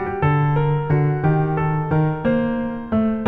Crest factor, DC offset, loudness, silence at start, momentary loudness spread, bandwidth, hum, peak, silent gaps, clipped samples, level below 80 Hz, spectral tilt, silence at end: 12 dB; under 0.1%; -20 LUFS; 0 s; 3 LU; 3.9 kHz; none; -6 dBFS; none; under 0.1%; -42 dBFS; -11 dB/octave; 0 s